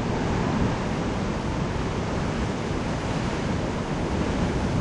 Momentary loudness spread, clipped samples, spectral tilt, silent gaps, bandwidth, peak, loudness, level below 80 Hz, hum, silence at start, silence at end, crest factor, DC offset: 3 LU; under 0.1%; -6.5 dB/octave; none; 11 kHz; -12 dBFS; -27 LUFS; -34 dBFS; none; 0 s; 0 s; 14 dB; under 0.1%